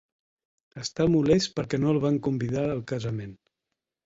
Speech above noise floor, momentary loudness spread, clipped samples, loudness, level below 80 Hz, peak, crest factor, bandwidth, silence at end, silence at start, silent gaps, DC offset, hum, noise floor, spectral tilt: 60 dB; 13 LU; under 0.1%; -26 LUFS; -54 dBFS; -10 dBFS; 18 dB; 8 kHz; 0.7 s; 0.75 s; none; under 0.1%; none; -85 dBFS; -6.5 dB/octave